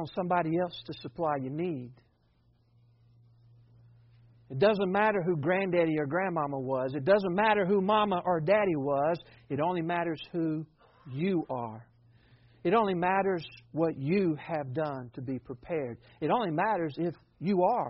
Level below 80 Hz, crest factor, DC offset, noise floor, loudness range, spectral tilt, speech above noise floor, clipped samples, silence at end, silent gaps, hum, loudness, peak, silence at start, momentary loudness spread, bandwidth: -66 dBFS; 18 dB; under 0.1%; -67 dBFS; 8 LU; -5.5 dB/octave; 38 dB; under 0.1%; 0 s; none; none; -30 LUFS; -12 dBFS; 0 s; 12 LU; 5.6 kHz